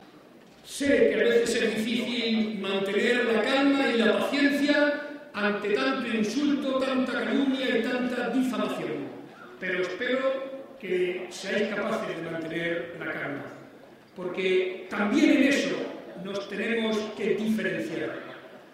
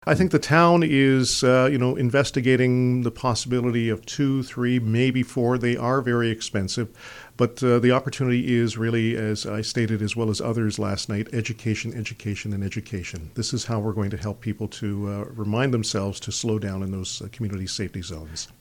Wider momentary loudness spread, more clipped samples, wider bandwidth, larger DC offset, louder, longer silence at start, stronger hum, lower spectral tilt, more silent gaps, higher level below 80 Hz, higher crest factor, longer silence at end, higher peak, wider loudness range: about the same, 13 LU vs 12 LU; neither; about the same, 15.5 kHz vs 16 kHz; neither; second, -27 LUFS vs -23 LUFS; about the same, 0 s vs 0.05 s; neither; about the same, -4.5 dB/octave vs -5.5 dB/octave; neither; second, -68 dBFS vs -50 dBFS; about the same, 18 dB vs 18 dB; about the same, 0.1 s vs 0.15 s; second, -10 dBFS vs -6 dBFS; about the same, 6 LU vs 8 LU